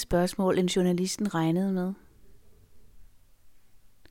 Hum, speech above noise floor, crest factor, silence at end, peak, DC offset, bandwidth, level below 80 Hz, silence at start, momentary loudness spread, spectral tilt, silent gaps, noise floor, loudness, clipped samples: none; 33 dB; 16 dB; 0.35 s; -12 dBFS; under 0.1%; 16.5 kHz; -52 dBFS; 0 s; 7 LU; -5.5 dB/octave; none; -59 dBFS; -27 LUFS; under 0.1%